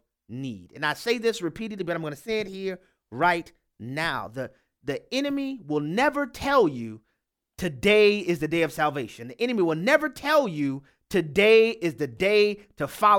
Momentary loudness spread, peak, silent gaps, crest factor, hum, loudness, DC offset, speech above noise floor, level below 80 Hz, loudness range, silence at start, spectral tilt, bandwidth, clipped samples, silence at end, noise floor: 17 LU; -4 dBFS; none; 20 dB; none; -25 LUFS; under 0.1%; 54 dB; -56 dBFS; 7 LU; 0.3 s; -5 dB/octave; 17 kHz; under 0.1%; 0 s; -78 dBFS